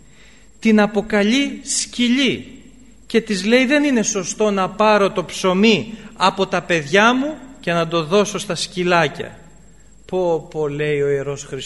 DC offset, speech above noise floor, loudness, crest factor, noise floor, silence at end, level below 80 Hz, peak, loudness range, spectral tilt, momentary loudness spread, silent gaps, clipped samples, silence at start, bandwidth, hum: 0.4%; 30 dB; -18 LUFS; 18 dB; -48 dBFS; 0 s; -50 dBFS; 0 dBFS; 4 LU; -4 dB/octave; 9 LU; none; under 0.1%; 0.6 s; 11.5 kHz; none